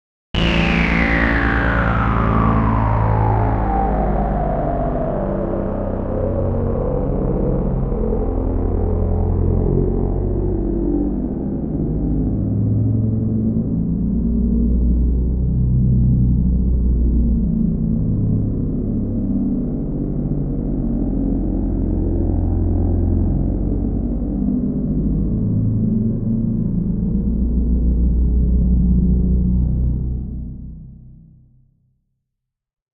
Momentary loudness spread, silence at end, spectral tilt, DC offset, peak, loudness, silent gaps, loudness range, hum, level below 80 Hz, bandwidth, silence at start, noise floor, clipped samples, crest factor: 6 LU; 1.8 s; -9.5 dB/octave; 0.5%; -4 dBFS; -19 LUFS; none; 3 LU; none; -22 dBFS; 5.6 kHz; 0.35 s; -79 dBFS; under 0.1%; 14 dB